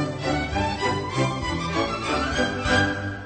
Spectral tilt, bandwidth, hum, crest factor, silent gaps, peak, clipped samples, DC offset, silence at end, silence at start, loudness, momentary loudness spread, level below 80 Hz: -5 dB/octave; 9.2 kHz; none; 16 dB; none; -10 dBFS; under 0.1%; under 0.1%; 0 s; 0 s; -24 LUFS; 4 LU; -38 dBFS